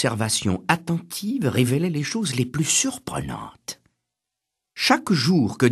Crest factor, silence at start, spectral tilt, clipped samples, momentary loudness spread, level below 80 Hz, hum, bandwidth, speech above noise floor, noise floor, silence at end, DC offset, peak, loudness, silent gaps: 22 dB; 0 s; -4 dB/octave; under 0.1%; 15 LU; -54 dBFS; none; 13 kHz; 61 dB; -84 dBFS; 0 s; under 0.1%; -2 dBFS; -22 LUFS; none